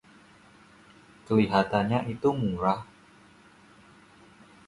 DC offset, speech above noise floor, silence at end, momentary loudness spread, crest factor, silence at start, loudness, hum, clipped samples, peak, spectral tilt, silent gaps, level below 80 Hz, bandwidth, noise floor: under 0.1%; 30 dB; 1.85 s; 6 LU; 22 dB; 1.3 s; -27 LUFS; none; under 0.1%; -8 dBFS; -7.5 dB/octave; none; -58 dBFS; 11.5 kHz; -56 dBFS